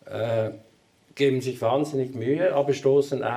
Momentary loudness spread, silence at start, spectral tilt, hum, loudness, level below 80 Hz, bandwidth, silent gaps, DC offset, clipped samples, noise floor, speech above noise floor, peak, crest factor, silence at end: 6 LU; 0.05 s; -6.5 dB/octave; none; -24 LUFS; -72 dBFS; 14 kHz; none; under 0.1%; under 0.1%; -59 dBFS; 36 dB; -10 dBFS; 14 dB; 0 s